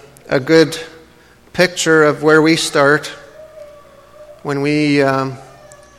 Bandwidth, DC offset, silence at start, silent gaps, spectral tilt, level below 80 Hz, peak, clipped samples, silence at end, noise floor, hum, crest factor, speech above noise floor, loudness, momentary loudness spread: 15.5 kHz; under 0.1%; 0.3 s; none; -4.5 dB/octave; -54 dBFS; 0 dBFS; under 0.1%; 0.55 s; -46 dBFS; none; 16 dB; 33 dB; -14 LUFS; 18 LU